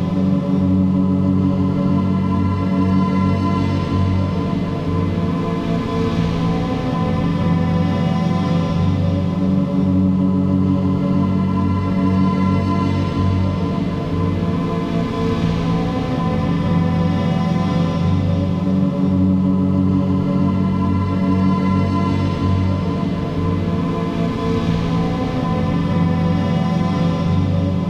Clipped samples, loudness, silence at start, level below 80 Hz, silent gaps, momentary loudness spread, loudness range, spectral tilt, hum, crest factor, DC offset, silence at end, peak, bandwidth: under 0.1%; -18 LUFS; 0 s; -36 dBFS; none; 4 LU; 2 LU; -8.5 dB/octave; none; 12 dB; under 0.1%; 0 s; -6 dBFS; 7.6 kHz